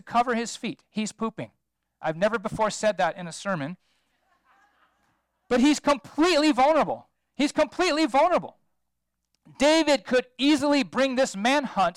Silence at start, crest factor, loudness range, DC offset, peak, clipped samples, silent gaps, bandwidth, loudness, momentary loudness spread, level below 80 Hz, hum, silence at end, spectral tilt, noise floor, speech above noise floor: 0.05 s; 14 dB; 6 LU; under 0.1%; -12 dBFS; under 0.1%; none; 13.5 kHz; -24 LUFS; 12 LU; -58 dBFS; none; 0.05 s; -4 dB/octave; -81 dBFS; 57 dB